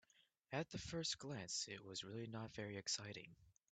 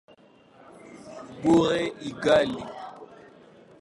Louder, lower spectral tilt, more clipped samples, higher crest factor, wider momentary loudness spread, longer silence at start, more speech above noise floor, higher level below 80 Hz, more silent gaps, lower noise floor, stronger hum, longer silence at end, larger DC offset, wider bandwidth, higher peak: second, -47 LUFS vs -24 LUFS; second, -3 dB/octave vs -5.5 dB/octave; neither; about the same, 22 dB vs 20 dB; second, 6 LU vs 24 LU; second, 0.5 s vs 0.85 s; second, 28 dB vs 32 dB; second, -74 dBFS vs -58 dBFS; neither; first, -77 dBFS vs -55 dBFS; neither; second, 0.2 s vs 0.75 s; neither; second, 9 kHz vs 11.5 kHz; second, -28 dBFS vs -6 dBFS